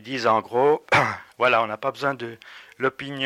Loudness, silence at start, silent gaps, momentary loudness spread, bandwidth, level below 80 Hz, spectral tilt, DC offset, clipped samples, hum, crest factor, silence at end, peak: -22 LUFS; 0.05 s; none; 9 LU; 15 kHz; -62 dBFS; -5 dB/octave; under 0.1%; under 0.1%; none; 16 dB; 0 s; -8 dBFS